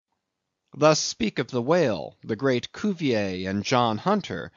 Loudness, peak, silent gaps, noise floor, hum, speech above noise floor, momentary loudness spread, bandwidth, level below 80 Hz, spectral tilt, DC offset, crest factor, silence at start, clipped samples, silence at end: -25 LUFS; -4 dBFS; none; -81 dBFS; none; 57 dB; 7 LU; 7.4 kHz; -60 dBFS; -4.5 dB/octave; under 0.1%; 20 dB; 0.75 s; under 0.1%; 0.1 s